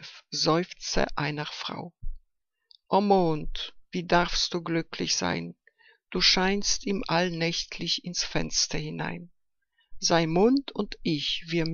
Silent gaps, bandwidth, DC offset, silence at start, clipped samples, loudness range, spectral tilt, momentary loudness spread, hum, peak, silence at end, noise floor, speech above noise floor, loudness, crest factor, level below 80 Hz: none; 7.6 kHz; under 0.1%; 0 s; under 0.1%; 3 LU; -3.5 dB/octave; 13 LU; none; -8 dBFS; 0 s; -75 dBFS; 48 dB; -27 LUFS; 20 dB; -42 dBFS